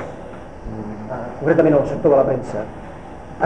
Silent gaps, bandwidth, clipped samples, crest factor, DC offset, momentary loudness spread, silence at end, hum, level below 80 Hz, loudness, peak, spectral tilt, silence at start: none; 9.4 kHz; under 0.1%; 16 dB; 0.9%; 21 LU; 0 s; none; -42 dBFS; -18 LUFS; -4 dBFS; -8.5 dB/octave; 0 s